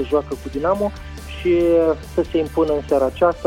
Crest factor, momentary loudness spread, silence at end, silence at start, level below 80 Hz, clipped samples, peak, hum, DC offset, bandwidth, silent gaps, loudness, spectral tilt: 16 dB; 9 LU; 0 s; 0 s; -36 dBFS; under 0.1%; -4 dBFS; none; under 0.1%; 15.5 kHz; none; -19 LUFS; -7 dB/octave